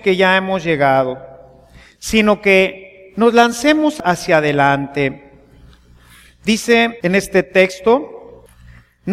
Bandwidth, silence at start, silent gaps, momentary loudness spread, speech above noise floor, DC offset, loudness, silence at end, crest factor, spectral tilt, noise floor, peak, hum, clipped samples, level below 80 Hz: 15.5 kHz; 0.05 s; none; 10 LU; 31 dB; under 0.1%; -14 LUFS; 0 s; 16 dB; -5 dB/octave; -45 dBFS; 0 dBFS; 60 Hz at -45 dBFS; under 0.1%; -46 dBFS